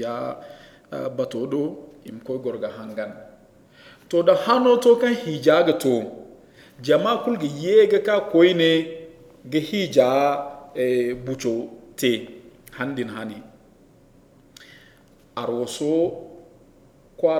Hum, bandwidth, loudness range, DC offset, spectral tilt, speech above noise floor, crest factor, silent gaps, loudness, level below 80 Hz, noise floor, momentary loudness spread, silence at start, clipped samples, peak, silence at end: none; 16 kHz; 11 LU; under 0.1%; -5.5 dB/octave; 32 dB; 20 dB; none; -21 LUFS; -62 dBFS; -53 dBFS; 19 LU; 0 s; under 0.1%; -2 dBFS; 0 s